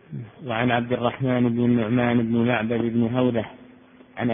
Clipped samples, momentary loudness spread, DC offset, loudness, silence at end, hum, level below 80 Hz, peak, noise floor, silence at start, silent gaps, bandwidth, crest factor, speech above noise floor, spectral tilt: under 0.1%; 11 LU; under 0.1%; -22 LUFS; 0 s; none; -54 dBFS; -6 dBFS; -50 dBFS; 0.1 s; none; 3.7 kHz; 18 dB; 28 dB; -12 dB/octave